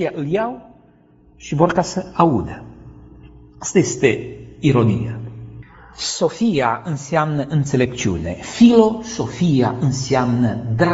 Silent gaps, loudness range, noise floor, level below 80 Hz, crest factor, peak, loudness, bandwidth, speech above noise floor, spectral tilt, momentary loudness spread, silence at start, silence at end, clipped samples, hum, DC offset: none; 4 LU; -51 dBFS; -44 dBFS; 18 dB; 0 dBFS; -18 LUFS; 8 kHz; 33 dB; -6 dB/octave; 14 LU; 0 s; 0 s; under 0.1%; none; under 0.1%